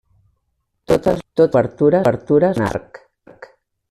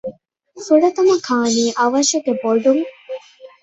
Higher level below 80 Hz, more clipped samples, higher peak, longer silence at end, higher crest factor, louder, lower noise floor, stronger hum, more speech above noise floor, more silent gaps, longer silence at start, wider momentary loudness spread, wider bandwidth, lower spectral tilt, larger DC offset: first, -48 dBFS vs -64 dBFS; neither; about the same, -2 dBFS vs -2 dBFS; first, 1.1 s vs 0.15 s; about the same, 16 dB vs 14 dB; about the same, -16 LUFS vs -16 LUFS; first, -71 dBFS vs -43 dBFS; neither; first, 55 dB vs 28 dB; neither; first, 0.9 s vs 0.05 s; second, 6 LU vs 18 LU; first, 13.5 kHz vs 8.4 kHz; first, -7.5 dB/octave vs -3 dB/octave; neither